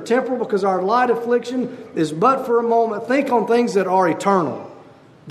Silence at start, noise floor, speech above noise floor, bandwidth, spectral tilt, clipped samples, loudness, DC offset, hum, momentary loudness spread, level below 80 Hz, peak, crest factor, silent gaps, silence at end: 0 s; -45 dBFS; 27 dB; 13.5 kHz; -6 dB/octave; under 0.1%; -19 LUFS; under 0.1%; none; 8 LU; -70 dBFS; -2 dBFS; 16 dB; none; 0 s